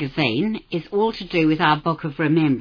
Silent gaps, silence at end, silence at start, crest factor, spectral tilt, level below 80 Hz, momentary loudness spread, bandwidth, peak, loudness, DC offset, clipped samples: none; 0 s; 0 s; 16 dB; -8 dB/octave; -50 dBFS; 7 LU; 5.4 kHz; -4 dBFS; -21 LUFS; under 0.1%; under 0.1%